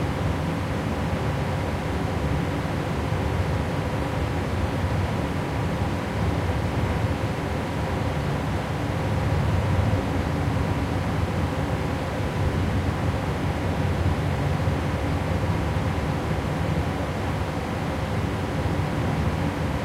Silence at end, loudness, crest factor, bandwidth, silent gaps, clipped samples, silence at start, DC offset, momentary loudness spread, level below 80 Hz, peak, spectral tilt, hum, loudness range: 0 s; -26 LUFS; 14 dB; 15.5 kHz; none; under 0.1%; 0 s; under 0.1%; 3 LU; -36 dBFS; -10 dBFS; -7 dB/octave; none; 1 LU